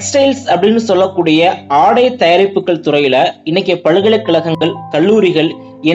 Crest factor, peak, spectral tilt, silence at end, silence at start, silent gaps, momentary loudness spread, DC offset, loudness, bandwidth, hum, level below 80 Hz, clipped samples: 10 dB; 0 dBFS; -5 dB/octave; 0 s; 0 s; none; 5 LU; under 0.1%; -11 LUFS; 8.2 kHz; none; -60 dBFS; under 0.1%